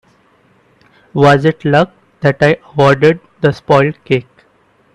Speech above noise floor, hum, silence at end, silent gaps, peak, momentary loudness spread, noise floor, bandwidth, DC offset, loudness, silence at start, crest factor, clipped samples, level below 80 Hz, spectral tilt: 41 dB; none; 0.75 s; none; 0 dBFS; 8 LU; -53 dBFS; 10 kHz; under 0.1%; -12 LUFS; 1.15 s; 14 dB; under 0.1%; -48 dBFS; -7 dB/octave